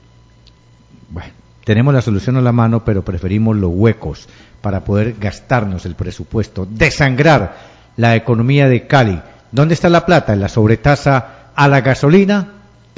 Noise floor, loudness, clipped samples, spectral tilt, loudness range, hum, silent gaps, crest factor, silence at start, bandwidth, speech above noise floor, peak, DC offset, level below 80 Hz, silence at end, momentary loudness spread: -46 dBFS; -14 LUFS; under 0.1%; -7.5 dB/octave; 5 LU; none; none; 14 dB; 1.1 s; 7.8 kHz; 33 dB; 0 dBFS; under 0.1%; -34 dBFS; 0.45 s; 14 LU